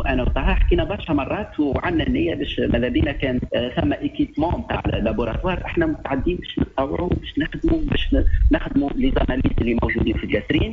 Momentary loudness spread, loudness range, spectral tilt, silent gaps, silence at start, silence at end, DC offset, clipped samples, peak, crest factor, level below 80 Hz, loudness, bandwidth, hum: 4 LU; 2 LU; -8.5 dB/octave; none; 0 s; 0 s; under 0.1%; under 0.1%; -6 dBFS; 14 dB; -26 dBFS; -22 LUFS; 6 kHz; none